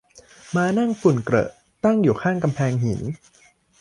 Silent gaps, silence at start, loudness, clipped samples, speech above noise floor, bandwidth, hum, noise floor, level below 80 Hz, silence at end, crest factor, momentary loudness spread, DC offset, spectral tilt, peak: none; 0.15 s; -21 LUFS; under 0.1%; 27 dB; 11.5 kHz; none; -48 dBFS; -52 dBFS; 0.65 s; 18 dB; 10 LU; under 0.1%; -7.5 dB/octave; -4 dBFS